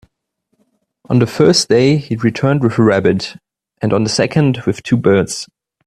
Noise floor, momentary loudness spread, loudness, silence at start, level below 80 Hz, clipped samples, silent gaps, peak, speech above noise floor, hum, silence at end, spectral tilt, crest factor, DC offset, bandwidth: -69 dBFS; 10 LU; -14 LUFS; 1.1 s; -50 dBFS; under 0.1%; none; 0 dBFS; 55 dB; none; 0.4 s; -5.5 dB/octave; 14 dB; under 0.1%; 13.5 kHz